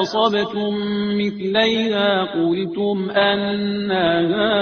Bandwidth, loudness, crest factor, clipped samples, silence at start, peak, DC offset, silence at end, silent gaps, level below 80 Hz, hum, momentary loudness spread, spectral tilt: 6.6 kHz; -19 LUFS; 16 dB; under 0.1%; 0 s; -2 dBFS; under 0.1%; 0 s; none; -56 dBFS; none; 5 LU; -3 dB/octave